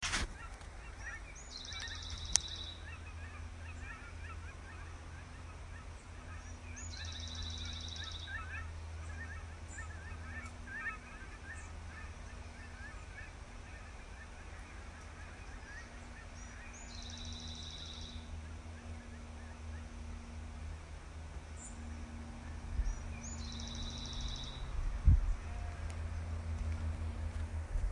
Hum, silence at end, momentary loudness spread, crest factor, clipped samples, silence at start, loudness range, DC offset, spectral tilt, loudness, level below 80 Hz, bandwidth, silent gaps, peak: none; 0 s; 10 LU; 38 dB; under 0.1%; 0 s; 11 LU; under 0.1%; -3 dB/octave; -44 LUFS; -44 dBFS; 11.5 kHz; none; -4 dBFS